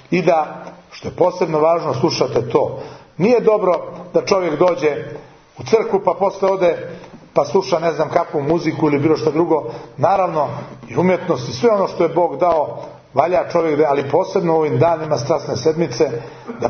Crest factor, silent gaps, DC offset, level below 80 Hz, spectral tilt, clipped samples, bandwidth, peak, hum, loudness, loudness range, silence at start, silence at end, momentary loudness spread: 18 dB; none; under 0.1%; -54 dBFS; -6.5 dB/octave; under 0.1%; 6.6 kHz; 0 dBFS; none; -17 LUFS; 1 LU; 0.1 s; 0 s; 12 LU